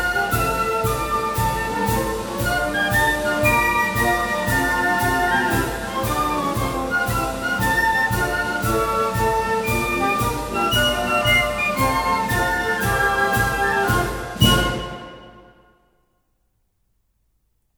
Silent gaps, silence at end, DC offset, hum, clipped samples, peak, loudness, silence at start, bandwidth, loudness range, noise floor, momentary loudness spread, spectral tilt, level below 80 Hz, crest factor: none; 2.35 s; under 0.1%; none; under 0.1%; -2 dBFS; -20 LUFS; 0 s; over 20 kHz; 3 LU; -68 dBFS; 6 LU; -4 dB/octave; -34 dBFS; 20 dB